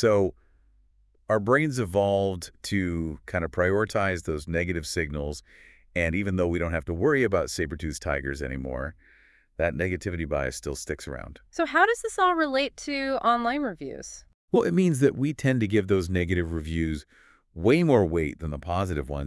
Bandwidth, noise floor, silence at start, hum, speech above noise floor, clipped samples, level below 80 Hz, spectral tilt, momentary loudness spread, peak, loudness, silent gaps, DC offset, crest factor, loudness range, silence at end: 12 kHz; -62 dBFS; 0 s; none; 36 dB; under 0.1%; -46 dBFS; -6 dB/octave; 12 LU; -8 dBFS; -26 LUFS; 14.34-14.48 s; under 0.1%; 20 dB; 4 LU; 0 s